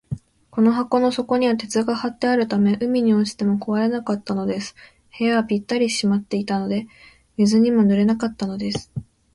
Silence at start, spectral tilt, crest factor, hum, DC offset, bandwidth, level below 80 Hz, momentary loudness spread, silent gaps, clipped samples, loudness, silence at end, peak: 0.1 s; -6 dB/octave; 14 dB; none; under 0.1%; 11.5 kHz; -54 dBFS; 11 LU; none; under 0.1%; -21 LUFS; 0.3 s; -6 dBFS